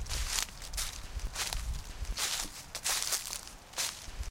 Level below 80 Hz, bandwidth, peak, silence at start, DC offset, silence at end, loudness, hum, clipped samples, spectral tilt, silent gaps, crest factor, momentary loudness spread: -42 dBFS; 17 kHz; -14 dBFS; 0 s; under 0.1%; 0 s; -35 LUFS; none; under 0.1%; -0.5 dB/octave; none; 24 dB; 10 LU